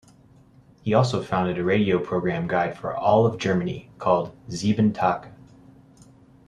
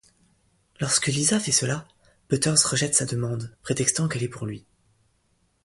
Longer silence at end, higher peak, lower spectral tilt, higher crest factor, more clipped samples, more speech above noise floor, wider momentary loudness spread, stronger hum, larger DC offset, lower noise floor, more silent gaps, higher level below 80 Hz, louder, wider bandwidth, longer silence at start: about the same, 1.15 s vs 1.05 s; about the same, -4 dBFS vs -4 dBFS; first, -7 dB/octave vs -3 dB/octave; about the same, 20 dB vs 24 dB; neither; second, 31 dB vs 43 dB; second, 8 LU vs 13 LU; neither; neither; second, -53 dBFS vs -68 dBFS; neither; about the same, -56 dBFS vs -58 dBFS; about the same, -23 LUFS vs -23 LUFS; about the same, 10.5 kHz vs 11.5 kHz; about the same, 0.85 s vs 0.8 s